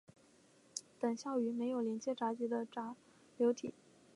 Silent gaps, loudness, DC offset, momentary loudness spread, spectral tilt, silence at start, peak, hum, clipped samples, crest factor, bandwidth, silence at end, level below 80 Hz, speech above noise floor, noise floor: none; -39 LUFS; under 0.1%; 12 LU; -4.5 dB/octave; 0.75 s; -20 dBFS; none; under 0.1%; 20 dB; 11.5 kHz; 0.45 s; -86 dBFS; 30 dB; -67 dBFS